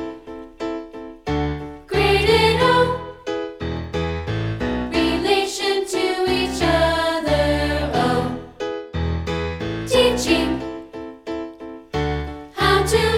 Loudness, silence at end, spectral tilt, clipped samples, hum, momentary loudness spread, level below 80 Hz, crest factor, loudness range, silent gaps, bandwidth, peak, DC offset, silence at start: -20 LUFS; 0 s; -5 dB/octave; under 0.1%; none; 15 LU; -34 dBFS; 18 dB; 3 LU; none; 16.5 kHz; -4 dBFS; under 0.1%; 0 s